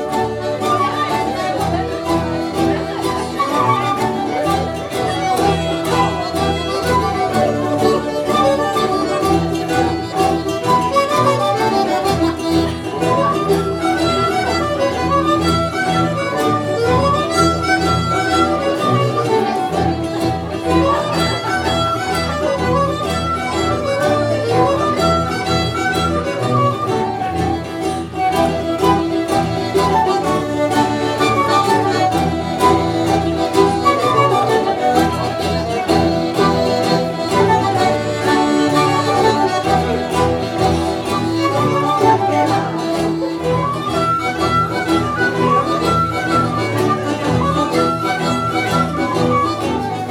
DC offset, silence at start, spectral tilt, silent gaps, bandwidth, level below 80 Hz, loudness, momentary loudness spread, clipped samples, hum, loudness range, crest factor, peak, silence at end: under 0.1%; 0 s; -5.5 dB/octave; none; 17 kHz; -38 dBFS; -16 LUFS; 5 LU; under 0.1%; none; 2 LU; 16 dB; 0 dBFS; 0 s